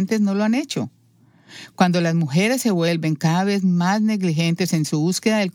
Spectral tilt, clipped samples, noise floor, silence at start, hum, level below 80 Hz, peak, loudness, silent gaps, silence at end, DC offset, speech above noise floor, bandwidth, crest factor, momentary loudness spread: -5.5 dB/octave; under 0.1%; -55 dBFS; 0 s; none; -70 dBFS; -2 dBFS; -20 LUFS; none; 0.05 s; under 0.1%; 36 dB; 17.5 kHz; 18 dB; 5 LU